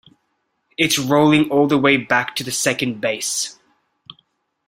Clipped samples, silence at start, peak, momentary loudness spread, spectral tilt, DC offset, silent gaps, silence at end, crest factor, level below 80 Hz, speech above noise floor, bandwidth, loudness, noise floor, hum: under 0.1%; 0.8 s; -2 dBFS; 8 LU; -3.5 dB/octave; under 0.1%; none; 1.15 s; 18 dB; -60 dBFS; 53 dB; 16 kHz; -17 LUFS; -70 dBFS; none